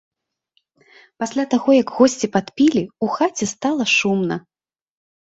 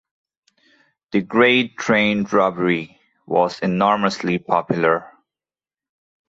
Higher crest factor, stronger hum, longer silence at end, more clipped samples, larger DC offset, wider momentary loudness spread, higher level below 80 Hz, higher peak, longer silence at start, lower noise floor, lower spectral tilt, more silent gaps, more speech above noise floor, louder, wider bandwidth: about the same, 18 dB vs 18 dB; neither; second, 0.85 s vs 1.2 s; neither; neither; about the same, 9 LU vs 9 LU; about the same, -62 dBFS vs -60 dBFS; about the same, -2 dBFS vs -2 dBFS; about the same, 1.2 s vs 1.1 s; second, -68 dBFS vs under -90 dBFS; about the same, -4.5 dB/octave vs -5.5 dB/octave; neither; second, 50 dB vs over 72 dB; about the same, -19 LUFS vs -19 LUFS; about the same, 8 kHz vs 8 kHz